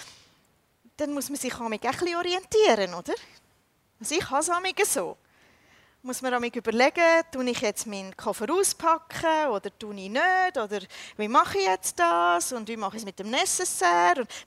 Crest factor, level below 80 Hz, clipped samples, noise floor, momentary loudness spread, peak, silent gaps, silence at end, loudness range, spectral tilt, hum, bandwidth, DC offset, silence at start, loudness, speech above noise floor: 20 dB; -64 dBFS; under 0.1%; -67 dBFS; 13 LU; -8 dBFS; none; 0.05 s; 3 LU; -2 dB/octave; none; 16 kHz; under 0.1%; 0 s; -25 LUFS; 41 dB